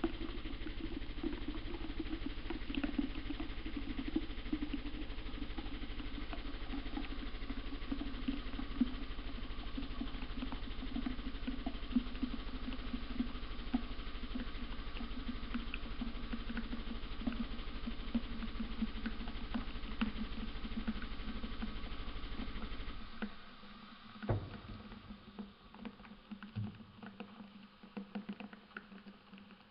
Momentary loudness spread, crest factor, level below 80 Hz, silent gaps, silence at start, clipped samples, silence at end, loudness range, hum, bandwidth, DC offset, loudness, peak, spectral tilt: 11 LU; 20 dB; -46 dBFS; none; 0 s; under 0.1%; 0 s; 5 LU; none; 5.6 kHz; under 0.1%; -44 LUFS; -20 dBFS; -4.5 dB/octave